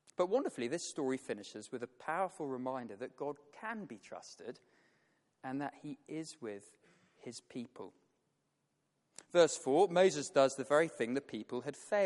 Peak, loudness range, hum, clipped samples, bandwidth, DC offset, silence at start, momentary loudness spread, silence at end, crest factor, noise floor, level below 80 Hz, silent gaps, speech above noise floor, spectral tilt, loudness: -14 dBFS; 15 LU; none; under 0.1%; 11.5 kHz; under 0.1%; 0.2 s; 20 LU; 0 s; 22 dB; -82 dBFS; -86 dBFS; none; 46 dB; -4 dB/octave; -36 LUFS